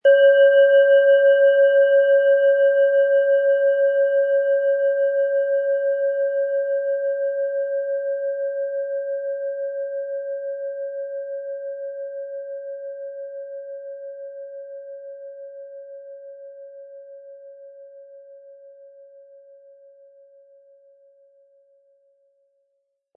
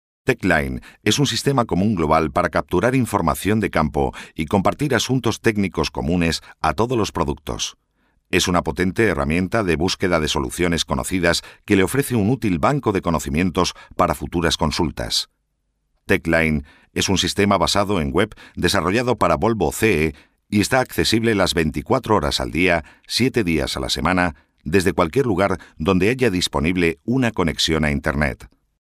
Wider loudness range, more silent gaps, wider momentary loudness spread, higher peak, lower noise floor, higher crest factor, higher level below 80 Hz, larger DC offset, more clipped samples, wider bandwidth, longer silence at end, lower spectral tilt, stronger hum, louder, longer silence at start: first, 23 LU vs 2 LU; neither; first, 24 LU vs 5 LU; about the same, -6 dBFS vs -4 dBFS; about the same, -73 dBFS vs -71 dBFS; about the same, 16 dB vs 16 dB; second, under -90 dBFS vs -36 dBFS; neither; neither; second, 3.1 kHz vs 15.5 kHz; first, 4.45 s vs 0.35 s; second, -2 dB/octave vs -4.5 dB/octave; neither; about the same, -19 LUFS vs -20 LUFS; second, 0.05 s vs 0.25 s